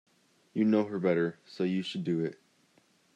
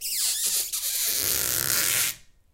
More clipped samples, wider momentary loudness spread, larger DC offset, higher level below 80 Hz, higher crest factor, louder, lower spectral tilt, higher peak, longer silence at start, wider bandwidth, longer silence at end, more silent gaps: neither; first, 8 LU vs 4 LU; neither; second, -80 dBFS vs -54 dBFS; second, 18 dB vs 26 dB; second, -31 LUFS vs -23 LUFS; first, -7.5 dB/octave vs 1 dB/octave; second, -14 dBFS vs -2 dBFS; first, 0.55 s vs 0 s; second, 9.6 kHz vs 17 kHz; first, 0.8 s vs 0.35 s; neither